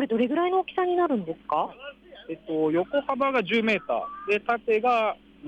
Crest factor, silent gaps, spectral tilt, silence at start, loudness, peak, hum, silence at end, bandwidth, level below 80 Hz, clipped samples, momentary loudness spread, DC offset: 12 dB; none; -6.5 dB/octave; 0 s; -25 LUFS; -14 dBFS; none; 0 s; 8.6 kHz; -64 dBFS; under 0.1%; 10 LU; under 0.1%